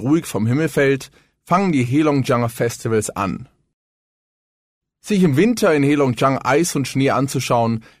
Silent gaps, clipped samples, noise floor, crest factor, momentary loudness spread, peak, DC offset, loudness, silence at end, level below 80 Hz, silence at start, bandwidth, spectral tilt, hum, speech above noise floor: 3.74-4.81 s; under 0.1%; under -90 dBFS; 16 dB; 7 LU; -4 dBFS; under 0.1%; -18 LUFS; 0.2 s; -52 dBFS; 0 s; 16 kHz; -6 dB/octave; none; over 73 dB